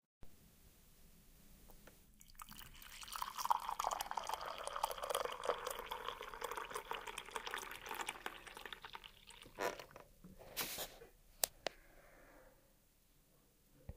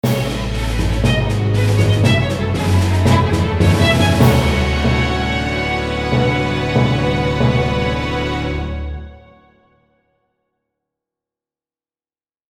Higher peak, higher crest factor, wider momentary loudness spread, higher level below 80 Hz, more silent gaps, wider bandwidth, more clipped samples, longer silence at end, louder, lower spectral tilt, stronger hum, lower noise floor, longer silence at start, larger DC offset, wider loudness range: second, -10 dBFS vs 0 dBFS; first, 36 dB vs 16 dB; first, 23 LU vs 8 LU; second, -66 dBFS vs -26 dBFS; neither; about the same, 16 kHz vs 17.5 kHz; neither; second, 0 s vs 3.3 s; second, -45 LUFS vs -16 LUFS; second, -1 dB/octave vs -6 dB/octave; neither; second, -72 dBFS vs under -90 dBFS; first, 0.25 s vs 0.05 s; neither; second, 6 LU vs 11 LU